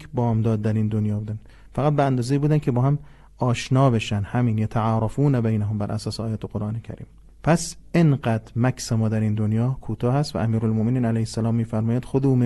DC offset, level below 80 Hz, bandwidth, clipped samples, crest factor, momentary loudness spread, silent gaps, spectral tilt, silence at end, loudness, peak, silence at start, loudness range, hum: under 0.1%; -46 dBFS; 12 kHz; under 0.1%; 16 dB; 8 LU; none; -7.5 dB/octave; 0 s; -23 LUFS; -6 dBFS; 0 s; 2 LU; none